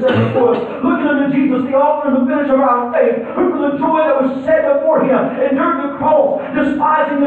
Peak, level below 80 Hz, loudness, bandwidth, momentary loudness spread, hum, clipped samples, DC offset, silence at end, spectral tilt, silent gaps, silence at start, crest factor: -2 dBFS; -52 dBFS; -14 LUFS; 4.5 kHz; 4 LU; none; under 0.1%; under 0.1%; 0 s; -9 dB/octave; none; 0 s; 12 dB